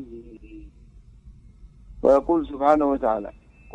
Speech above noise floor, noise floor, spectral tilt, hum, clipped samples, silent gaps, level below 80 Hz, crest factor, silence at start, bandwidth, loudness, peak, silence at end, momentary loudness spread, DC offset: 28 dB; -49 dBFS; -8 dB/octave; none; under 0.1%; none; -46 dBFS; 20 dB; 0 s; 8.6 kHz; -21 LUFS; -4 dBFS; 0.45 s; 24 LU; under 0.1%